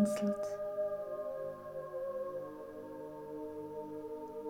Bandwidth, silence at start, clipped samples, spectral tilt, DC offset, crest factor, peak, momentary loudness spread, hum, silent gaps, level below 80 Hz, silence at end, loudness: 17 kHz; 0 s; under 0.1%; -6.5 dB/octave; under 0.1%; 20 dB; -20 dBFS; 10 LU; 50 Hz at -70 dBFS; none; -72 dBFS; 0 s; -41 LUFS